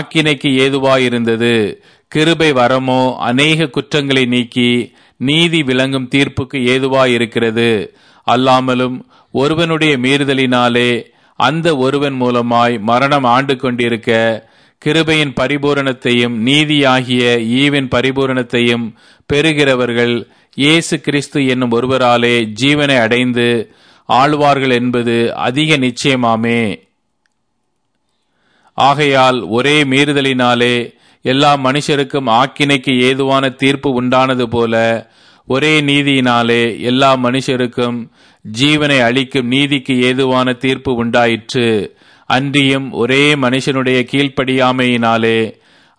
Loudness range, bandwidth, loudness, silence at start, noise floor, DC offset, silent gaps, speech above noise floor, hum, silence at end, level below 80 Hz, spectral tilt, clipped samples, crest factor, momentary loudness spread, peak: 2 LU; 10.5 kHz; -12 LUFS; 0 s; -68 dBFS; 0.1%; none; 56 dB; none; 0.5 s; -50 dBFS; -5 dB/octave; under 0.1%; 14 dB; 6 LU; 0 dBFS